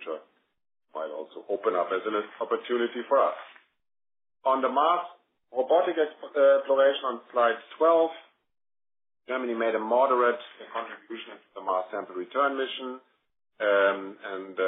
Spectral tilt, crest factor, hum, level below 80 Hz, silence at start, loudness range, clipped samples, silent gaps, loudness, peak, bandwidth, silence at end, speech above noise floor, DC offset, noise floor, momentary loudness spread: 2.5 dB/octave; 18 dB; none; -86 dBFS; 0 s; 5 LU; under 0.1%; none; -27 LUFS; -10 dBFS; 3.9 kHz; 0 s; 24 dB; under 0.1%; -50 dBFS; 17 LU